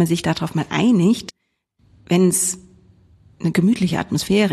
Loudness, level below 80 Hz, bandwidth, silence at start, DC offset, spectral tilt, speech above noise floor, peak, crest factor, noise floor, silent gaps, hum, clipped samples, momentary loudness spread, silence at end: -19 LUFS; -52 dBFS; 13.5 kHz; 0 s; under 0.1%; -5 dB/octave; 50 dB; -4 dBFS; 14 dB; -68 dBFS; none; none; under 0.1%; 8 LU; 0 s